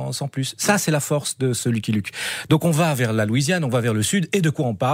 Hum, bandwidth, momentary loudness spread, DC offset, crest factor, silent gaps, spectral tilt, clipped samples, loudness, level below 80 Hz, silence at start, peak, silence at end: none; 16 kHz; 6 LU; under 0.1%; 18 dB; none; -5 dB/octave; under 0.1%; -21 LUFS; -58 dBFS; 0 s; -4 dBFS; 0 s